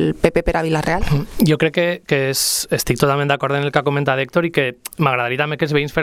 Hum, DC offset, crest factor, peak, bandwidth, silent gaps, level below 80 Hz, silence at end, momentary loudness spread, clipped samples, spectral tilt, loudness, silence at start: none; under 0.1%; 18 dB; 0 dBFS; 18.5 kHz; none; -34 dBFS; 0 s; 3 LU; under 0.1%; -4.5 dB/octave; -18 LUFS; 0 s